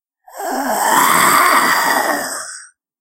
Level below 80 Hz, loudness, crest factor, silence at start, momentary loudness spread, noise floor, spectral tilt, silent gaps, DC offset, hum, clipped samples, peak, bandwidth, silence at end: -58 dBFS; -13 LUFS; 16 dB; 0.35 s; 17 LU; -37 dBFS; -1 dB/octave; none; under 0.1%; none; under 0.1%; 0 dBFS; 16 kHz; 0.35 s